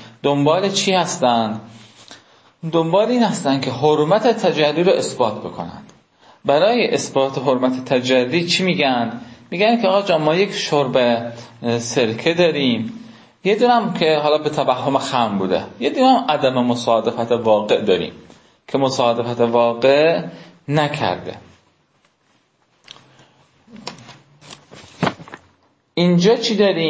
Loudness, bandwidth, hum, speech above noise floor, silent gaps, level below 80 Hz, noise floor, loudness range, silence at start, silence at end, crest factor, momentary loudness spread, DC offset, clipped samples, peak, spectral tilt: -17 LUFS; 8 kHz; none; 44 dB; none; -60 dBFS; -61 dBFS; 6 LU; 0 s; 0 s; 16 dB; 13 LU; under 0.1%; under 0.1%; -2 dBFS; -5 dB/octave